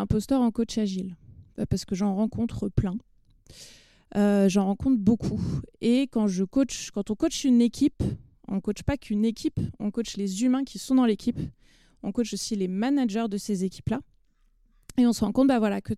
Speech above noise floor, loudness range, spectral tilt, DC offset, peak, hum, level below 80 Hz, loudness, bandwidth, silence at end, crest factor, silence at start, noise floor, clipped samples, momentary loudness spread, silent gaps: 38 dB; 5 LU; -6 dB/octave; under 0.1%; -8 dBFS; none; -48 dBFS; -26 LUFS; 13.5 kHz; 0 s; 18 dB; 0 s; -63 dBFS; under 0.1%; 11 LU; none